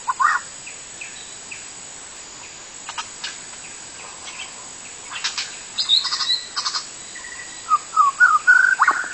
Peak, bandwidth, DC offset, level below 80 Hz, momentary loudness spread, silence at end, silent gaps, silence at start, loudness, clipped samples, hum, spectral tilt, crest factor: -4 dBFS; 8.8 kHz; under 0.1%; -62 dBFS; 20 LU; 0 s; none; 0 s; -18 LUFS; under 0.1%; none; 2 dB/octave; 18 dB